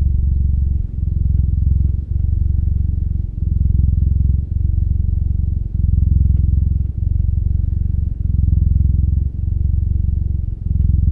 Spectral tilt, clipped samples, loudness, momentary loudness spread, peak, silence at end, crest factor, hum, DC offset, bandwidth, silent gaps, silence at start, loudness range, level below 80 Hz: -13.5 dB/octave; under 0.1%; -18 LUFS; 5 LU; -2 dBFS; 0 s; 12 dB; none; under 0.1%; 0.7 kHz; none; 0 s; 1 LU; -18 dBFS